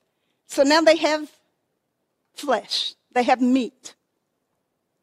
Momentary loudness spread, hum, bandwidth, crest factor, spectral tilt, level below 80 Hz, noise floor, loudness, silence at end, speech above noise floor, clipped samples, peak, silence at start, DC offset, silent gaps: 15 LU; none; 15 kHz; 20 dB; -2.5 dB/octave; -70 dBFS; -75 dBFS; -20 LUFS; 1.15 s; 55 dB; under 0.1%; -4 dBFS; 0.5 s; under 0.1%; none